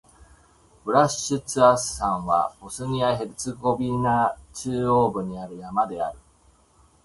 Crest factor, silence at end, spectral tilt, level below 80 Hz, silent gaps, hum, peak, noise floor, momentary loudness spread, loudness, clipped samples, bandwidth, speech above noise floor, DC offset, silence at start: 20 dB; 0.85 s; -5 dB/octave; -50 dBFS; none; none; -4 dBFS; -58 dBFS; 13 LU; -24 LUFS; under 0.1%; 12 kHz; 35 dB; under 0.1%; 0.2 s